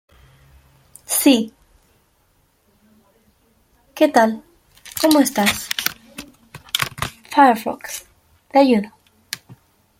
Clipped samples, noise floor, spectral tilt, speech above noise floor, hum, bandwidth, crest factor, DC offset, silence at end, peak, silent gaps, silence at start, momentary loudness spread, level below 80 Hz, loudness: under 0.1%; -61 dBFS; -3 dB/octave; 46 dB; none; 16.5 kHz; 20 dB; under 0.1%; 0.45 s; 0 dBFS; none; 1.1 s; 19 LU; -56 dBFS; -17 LUFS